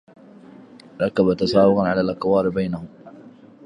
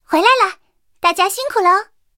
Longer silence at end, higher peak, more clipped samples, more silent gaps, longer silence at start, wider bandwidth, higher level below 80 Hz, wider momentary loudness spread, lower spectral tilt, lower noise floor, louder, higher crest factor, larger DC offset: about the same, 0.35 s vs 0.35 s; second, -4 dBFS vs 0 dBFS; neither; neither; first, 1 s vs 0.1 s; second, 10 kHz vs 17 kHz; first, -52 dBFS vs -60 dBFS; first, 11 LU vs 6 LU; first, -7.5 dB/octave vs -0.5 dB/octave; second, -45 dBFS vs -50 dBFS; second, -20 LUFS vs -15 LUFS; about the same, 18 dB vs 16 dB; neither